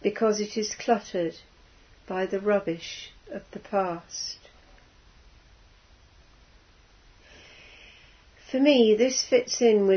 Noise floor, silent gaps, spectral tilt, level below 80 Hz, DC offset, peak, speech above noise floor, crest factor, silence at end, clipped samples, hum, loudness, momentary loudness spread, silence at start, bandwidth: -57 dBFS; none; -4 dB/octave; -60 dBFS; under 0.1%; -8 dBFS; 32 dB; 20 dB; 0 s; under 0.1%; none; -25 LUFS; 20 LU; 0.05 s; 6.6 kHz